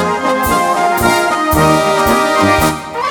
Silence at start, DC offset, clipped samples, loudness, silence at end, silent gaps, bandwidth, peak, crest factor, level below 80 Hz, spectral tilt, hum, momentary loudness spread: 0 s; under 0.1%; under 0.1%; -12 LUFS; 0 s; none; over 20 kHz; 0 dBFS; 12 dB; -32 dBFS; -4.5 dB/octave; none; 4 LU